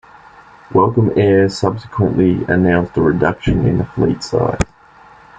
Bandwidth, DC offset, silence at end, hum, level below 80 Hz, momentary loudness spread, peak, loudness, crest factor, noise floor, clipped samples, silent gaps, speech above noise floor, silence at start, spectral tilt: 9.2 kHz; under 0.1%; 0.75 s; none; -34 dBFS; 6 LU; -2 dBFS; -15 LUFS; 14 dB; -44 dBFS; under 0.1%; none; 30 dB; 0.7 s; -7.5 dB/octave